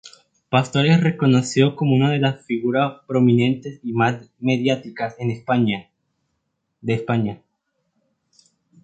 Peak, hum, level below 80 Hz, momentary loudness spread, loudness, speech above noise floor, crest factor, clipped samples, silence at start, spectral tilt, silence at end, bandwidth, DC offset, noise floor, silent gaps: -2 dBFS; none; -60 dBFS; 10 LU; -20 LUFS; 55 dB; 20 dB; under 0.1%; 0.05 s; -6.5 dB/octave; 1.5 s; 9 kHz; under 0.1%; -74 dBFS; none